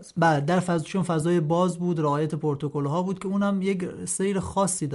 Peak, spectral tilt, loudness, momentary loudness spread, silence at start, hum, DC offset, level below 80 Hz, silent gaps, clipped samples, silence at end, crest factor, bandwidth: -10 dBFS; -6 dB/octave; -25 LUFS; 5 LU; 0 s; none; under 0.1%; -56 dBFS; none; under 0.1%; 0 s; 14 dB; 11.5 kHz